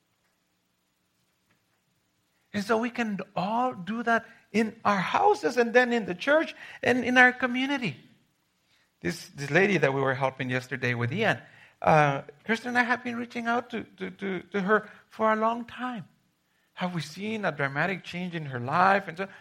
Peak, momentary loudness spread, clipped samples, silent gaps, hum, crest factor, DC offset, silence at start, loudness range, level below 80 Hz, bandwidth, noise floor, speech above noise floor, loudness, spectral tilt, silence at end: -4 dBFS; 12 LU; under 0.1%; none; none; 24 dB; under 0.1%; 2.55 s; 7 LU; -70 dBFS; 15 kHz; -74 dBFS; 47 dB; -27 LUFS; -5.5 dB/octave; 0.05 s